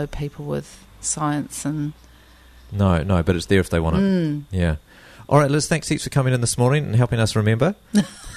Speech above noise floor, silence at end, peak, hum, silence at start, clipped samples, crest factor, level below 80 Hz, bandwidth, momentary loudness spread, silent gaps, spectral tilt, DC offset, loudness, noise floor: 28 dB; 0 s; -2 dBFS; none; 0 s; under 0.1%; 18 dB; -38 dBFS; 13.5 kHz; 10 LU; none; -5.5 dB/octave; under 0.1%; -21 LUFS; -48 dBFS